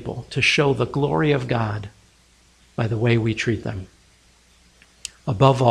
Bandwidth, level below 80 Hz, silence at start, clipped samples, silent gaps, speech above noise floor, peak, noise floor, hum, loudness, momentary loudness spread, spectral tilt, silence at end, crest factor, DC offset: 11 kHz; -48 dBFS; 0 s; under 0.1%; none; 36 dB; -2 dBFS; -56 dBFS; none; -21 LUFS; 18 LU; -6 dB/octave; 0 s; 22 dB; under 0.1%